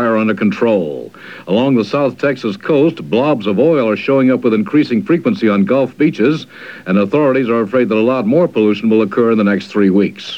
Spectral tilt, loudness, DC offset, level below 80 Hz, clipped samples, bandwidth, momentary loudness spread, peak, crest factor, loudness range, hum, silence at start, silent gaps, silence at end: -8 dB/octave; -14 LUFS; 0.2%; -68 dBFS; under 0.1%; 8 kHz; 5 LU; 0 dBFS; 12 dB; 2 LU; none; 0 s; none; 0 s